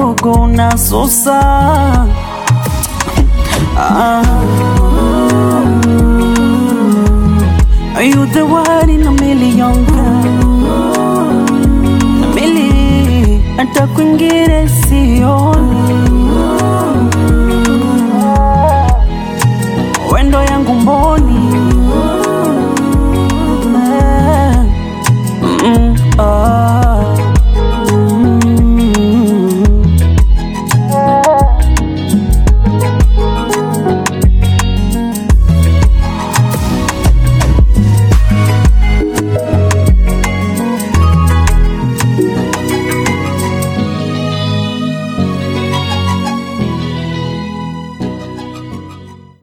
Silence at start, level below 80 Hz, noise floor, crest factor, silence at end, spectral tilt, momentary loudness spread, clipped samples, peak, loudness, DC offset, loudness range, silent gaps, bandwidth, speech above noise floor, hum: 0 s; -14 dBFS; -33 dBFS; 10 dB; 0.25 s; -6 dB/octave; 6 LU; under 0.1%; 0 dBFS; -11 LUFS; under 0.1%; 4 LU; none; 17.5 kHz; 24 dB; none